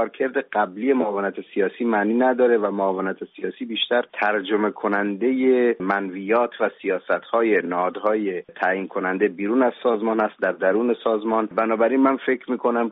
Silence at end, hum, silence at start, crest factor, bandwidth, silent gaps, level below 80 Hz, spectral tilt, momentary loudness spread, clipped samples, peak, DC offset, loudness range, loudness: 0 s; none; 0 s; 14 dB; 4.7 kHz; none; -72 dBFS; -3 dB/octave; 6 LU; under 0.1%; -6 dBFS; under 0.1%; 1 LU; -22 LUFS